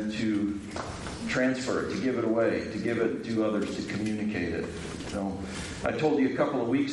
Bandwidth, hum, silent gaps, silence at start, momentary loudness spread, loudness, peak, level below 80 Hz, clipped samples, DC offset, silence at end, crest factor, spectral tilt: 11.5 kHz; none; none; 0 s; 10 LU; -30 LUFS; -12 dBFS; -54 dBFS; under 0.1%; under 0.1%; 0 s; 16 dB; -5.5 dB/octave